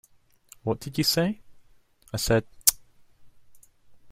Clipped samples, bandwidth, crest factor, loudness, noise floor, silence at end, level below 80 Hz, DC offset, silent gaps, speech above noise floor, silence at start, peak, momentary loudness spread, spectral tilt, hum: under 0.1%; 16 kHz; 30 dB; -25 LUFS; -57 dBFS; 0 s; -50 dBFS; under 0.1%; none; 32 dB; 0.65 s; 0 dBFS; 13 LU; -3.5 dB/octave; none